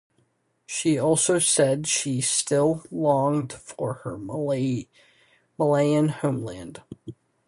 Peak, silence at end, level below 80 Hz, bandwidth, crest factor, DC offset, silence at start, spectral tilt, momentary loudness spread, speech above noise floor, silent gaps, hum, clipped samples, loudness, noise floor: -8 dBFS; 0.35 s; -62 dBFS; 11.5 kHz; 16 dB; under 0.1%; 0.7 s; -4.5 dB/octave; 16 LU; 44 dB; none; none; under 0.1%; -23 LUFS; -68 dBFS